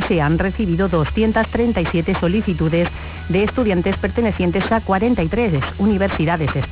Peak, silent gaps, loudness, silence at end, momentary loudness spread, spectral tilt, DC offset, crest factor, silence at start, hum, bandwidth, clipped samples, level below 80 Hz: -6 dBFS; none; -18 LUFS; 0 s; 2 LU; -11.5 dB/octave; under 0.1%; 12 dB; 0 s; none; 4 kHz; under 0.1%; -30 dBFS